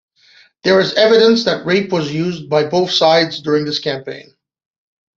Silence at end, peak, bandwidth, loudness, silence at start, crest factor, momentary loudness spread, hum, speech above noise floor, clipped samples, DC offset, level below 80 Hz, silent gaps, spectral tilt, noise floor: 0.95 s; 0 dBFS; 7.6 kHz; -14 LUFS; 0.65 s; 14 dB; 11 LU; none; 35 dB; under 0.1%; under 0.1%; -58 dBFS; none; -5 dB/octave; -50 dBFS